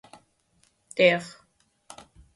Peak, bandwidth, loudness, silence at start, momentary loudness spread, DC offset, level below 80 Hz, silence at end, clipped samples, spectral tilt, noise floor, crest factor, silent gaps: -6 dBFS; 11.5 kHz; -23 LUFS; 0.95 s; 27 LU; under 0.1%; -66 dBFS; 1.05 s; under 0.1%; -4.5 dB/octave; -67 dBFS; 24 dB; none